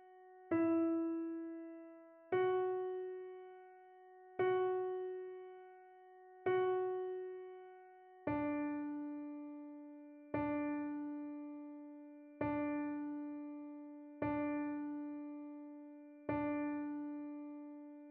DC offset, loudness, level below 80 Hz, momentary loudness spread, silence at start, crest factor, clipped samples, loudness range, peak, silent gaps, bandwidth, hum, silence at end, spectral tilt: under 0.1%; -41 LUFS; -74 dBFS; 21 LU; 0 s; 16 dB; under 0.1%; 5 LU; -24 dBFS; none; 3.8 kHz; none; 0 s; -6 dB/octave